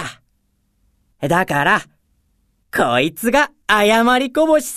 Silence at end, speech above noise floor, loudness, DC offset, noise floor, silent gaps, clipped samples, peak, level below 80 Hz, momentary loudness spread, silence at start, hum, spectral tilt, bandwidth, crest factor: 0 s; 49 dB; -16 LUFS; under 0.1%; -64 dBFS; none; under 0.1%; 0 dBFS; -48 dBFS; 7 LU; 0 s; none; -4 dB/octave; 14 kHz; 18 dB